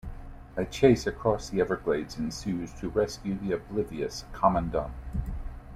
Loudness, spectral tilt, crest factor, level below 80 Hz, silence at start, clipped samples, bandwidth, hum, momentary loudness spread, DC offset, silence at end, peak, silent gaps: -29 LUFS; -6 dB/octave; 22 dB; -42 dBFS; 0.05 s; under 0.1%; 14.5 kHz; none; 13 LU; under 0.1%; 0 s; -6 dBFS; none